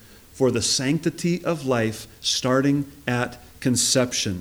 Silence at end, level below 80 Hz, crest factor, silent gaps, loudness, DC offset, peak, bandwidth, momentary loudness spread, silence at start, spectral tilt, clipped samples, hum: 0 s; -54 dBFS; 16 dB; none; -23 LUFS; under 0.1%; -6 dBFS; over 20 kHz; 7 LU; 0.35 s; -4 dB/octave; under 0.1%; none